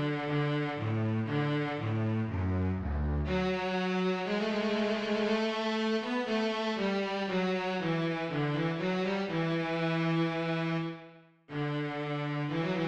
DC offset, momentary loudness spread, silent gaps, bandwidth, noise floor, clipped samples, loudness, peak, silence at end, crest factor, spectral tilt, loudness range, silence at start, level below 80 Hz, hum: under 0.1%; 3 LU; none; 8.8 kHz; -54 dBFS; under 0.1%; -32 LUFS; -18 dBFS; 0 s; 12 dB; -7 dB/octave; 2 LU; 0 s; -48 dBFS; none